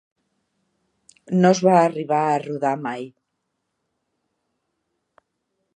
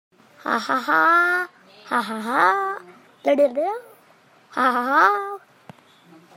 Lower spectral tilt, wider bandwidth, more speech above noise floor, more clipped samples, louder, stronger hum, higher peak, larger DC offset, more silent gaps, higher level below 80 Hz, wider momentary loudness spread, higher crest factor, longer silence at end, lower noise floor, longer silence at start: first, -6.5 dB/octave vs -4 dB/octave; second, 9.4 kHz vs 16 kHz; first, 58 dB vs 35 dB; neither; about the same, -20 LUFS vs -20 LUFS; neither; about the same, -2 dBFS vs -2 dBFS; neither; neither; first, -74 dBFS vs -82 dBFS; second, 14 LU vs 17 LU; about the same, 20 dB vs 20 dB; first, 2.65 s vs 1 s; first, -77 dBFS vs -54 dBFS; first, 1.3 s vs 0.45 s